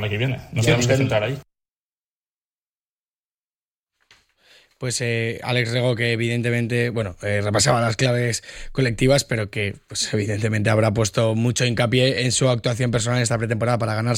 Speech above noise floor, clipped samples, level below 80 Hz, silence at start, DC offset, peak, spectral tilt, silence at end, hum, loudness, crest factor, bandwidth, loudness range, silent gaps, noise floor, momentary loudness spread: over 69 dB; under 0.1%; -46 dBFS; 0 s; under 0.1%; -4 dBFS; -4.5 dB/octave; 0 s; none; -21 LUFS; 16 dB; 16 kHz; 8 LU; 1.79-3.87 s; under -90 dBFS; 7 LU